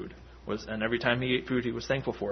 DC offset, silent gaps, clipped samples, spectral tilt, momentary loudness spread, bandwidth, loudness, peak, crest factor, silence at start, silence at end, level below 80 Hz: under 0.1%; none; under 0.1%; -6 dB/octave; 11 LU; 6.4 kHz; -30 LUFS; -10 dBFS; 22 dB; 0 s; 0 s; -52 dBFS